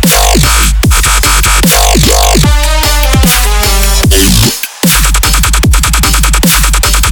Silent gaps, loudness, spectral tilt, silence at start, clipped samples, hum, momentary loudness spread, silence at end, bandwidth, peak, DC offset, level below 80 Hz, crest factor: none; -7 LUFS; -3 dB/octave; 0 s; 1%; none; 3 LU; 0 s; over 20 kHz; 0 dBFS; under 0.1%; -10 dBFS; 6 dB